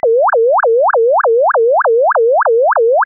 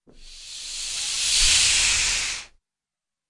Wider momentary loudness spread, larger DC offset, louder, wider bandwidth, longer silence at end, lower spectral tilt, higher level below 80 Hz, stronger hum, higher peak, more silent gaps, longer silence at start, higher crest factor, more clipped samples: second, 0 LU vs 17 LU; neither; first, -11 LUFS vs -19 LUFS; second, 1.9 kHz vs 11.5 kHz; second, 0 s vs 0.85 s; second, 8.5 dB/octave vs 2 dB/octave; second, -66 dBFS vs -40 dBFS; neither; about the same, -6 dBFS vs -6 dBFS; neither; about the same, 0.05 s vs 0.15 s; second, 4 dB vs 20 dB; neither